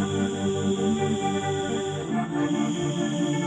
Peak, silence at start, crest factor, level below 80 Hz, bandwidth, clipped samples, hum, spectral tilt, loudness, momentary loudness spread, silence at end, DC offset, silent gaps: -14 dBFS; 0 s; 12 dB; -58 dBFS; 10.5 kHz; under 0.1%; none; -5.5 dB/octave; -26 LUFS; 3 LU; 0 s; under 0.1%; none